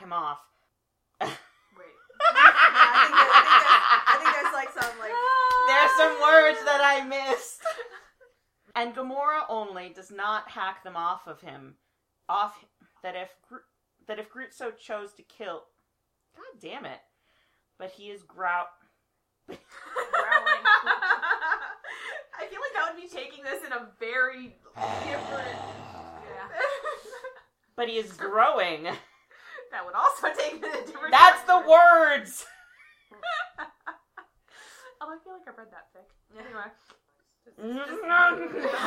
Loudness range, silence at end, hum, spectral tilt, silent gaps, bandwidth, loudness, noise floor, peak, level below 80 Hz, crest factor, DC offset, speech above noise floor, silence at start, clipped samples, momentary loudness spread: 22 LU; 0 s; none; -2 dB/octave; none; 16.5 kHz; -22 LUFS; -77 dBFS; 0 dBFS; -70 dBFS; 26 dB; under 0.1%; 52 dB; 0 s; under 0.1%; 26 LU